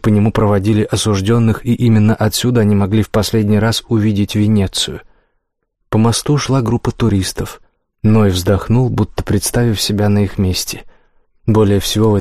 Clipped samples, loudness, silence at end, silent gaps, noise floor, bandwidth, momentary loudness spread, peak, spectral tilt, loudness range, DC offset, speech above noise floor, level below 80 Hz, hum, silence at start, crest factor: under 0.1%; -14 LUFS; 0 s; none; -68 dBFS; 15.5 kHz; 6 LU; -2 dBFS; -6 dB/octave; 3 LU; 0.8%; 55 dB; -34 dBFS; none; 0 s; 12 dB